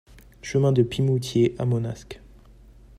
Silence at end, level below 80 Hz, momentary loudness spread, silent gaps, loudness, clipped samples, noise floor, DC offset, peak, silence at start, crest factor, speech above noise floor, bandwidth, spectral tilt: 0.8 s; -50 dBFS; 19 LU; none; -23 LUFS; under 0.1%; -49 dBFS; under 0.1%; -6 dBFS; 0.15 s; 18 dB; 27 dB; 14 kHz; -7 dB/octave